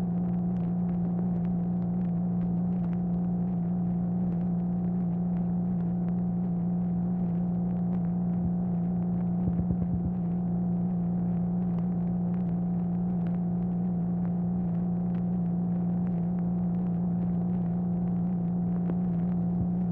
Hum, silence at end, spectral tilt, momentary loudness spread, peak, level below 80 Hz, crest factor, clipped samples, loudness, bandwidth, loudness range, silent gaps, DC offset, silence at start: none; 0 s; -14 dB/octave; 1 LU; -16 dBFS; -48 dBFS; 12 dB; under 0.1%; -29 LUFS; 2.1 kHz; 0 LU; none; under 0.1%; 0 s